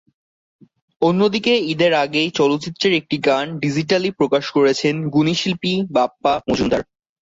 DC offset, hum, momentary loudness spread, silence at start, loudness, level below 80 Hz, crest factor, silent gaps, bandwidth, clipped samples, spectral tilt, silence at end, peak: under 0.1%; none; 4 LU; 1 s; -18 LUFS; -52 dBFS; 16 dB; none; 7.8 kHz; under 0.1%; -5.5 dB/octave; 0.4 s; -4 dBFS